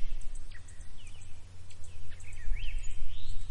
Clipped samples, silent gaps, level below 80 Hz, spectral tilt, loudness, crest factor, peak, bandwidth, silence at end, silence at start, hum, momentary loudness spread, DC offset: under 0.1%; none; -36 dBFS; -3.5 dB/octave; -46 LUFS; 10 dB; -14 dBFS; 9.2 kHz; 0 s; 0 s; none; 11 LU; under 0.1%